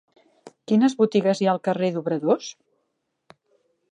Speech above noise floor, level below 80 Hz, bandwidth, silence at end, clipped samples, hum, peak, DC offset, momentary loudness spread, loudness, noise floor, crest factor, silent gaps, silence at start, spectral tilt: 55 dB; -76 dBFS; 9.8 kHz; 1.4 s; under 0.1%; none; -8 dBFS; under 0.1%; 6 LU; -22 LUFS; -76 dBFS; 18 dB; none; 0.45 s; -6.5 dB/octave